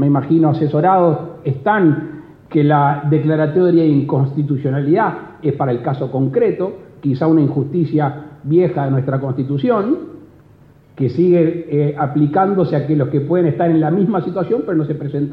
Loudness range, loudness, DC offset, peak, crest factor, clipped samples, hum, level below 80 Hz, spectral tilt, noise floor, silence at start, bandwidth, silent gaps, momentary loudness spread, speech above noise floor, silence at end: 3 LU; -16 LUFS; under 0.1%; -2 dBFS; 14 dB; under 0.1%; none; -56 dBFS; -11.5 dB/octave; -46 dBFS; 0 s; 5.2 kHz; none; 8 LU; 31 dB; 0 s